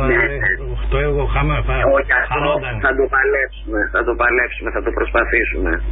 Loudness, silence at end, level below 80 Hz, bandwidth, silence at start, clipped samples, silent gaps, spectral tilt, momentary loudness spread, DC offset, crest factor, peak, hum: -17 LUFS; 0 s; -24 dBFS; 4 kHz; 0 s; under 0.1%; none; -11.5 dB/octave; 6 LU; under 0.1%; 14 dB; -4 dBFS; none